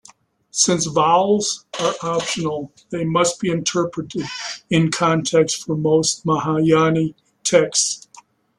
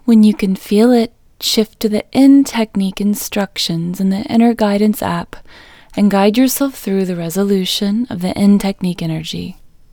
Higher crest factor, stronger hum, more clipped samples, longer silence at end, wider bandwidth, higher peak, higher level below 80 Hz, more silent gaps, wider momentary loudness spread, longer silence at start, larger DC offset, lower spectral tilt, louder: about the same, 18 dB vs 14 dB; neither; neither; first, 0.4 s vs 0.25 s; second, 12.5 kHz vs over 20 kHz; about the same, -2 dBFS vs 0 dBFS; second, -58 dBFS vs -46 dBFS; neither; about the same, 11 LU vs 10 LU; first, 0.55 s vs 0.05 s; neither; second, -4 dB/octave vs -5.5 dB/octave; second, -19 LUFS vs -15 LUFS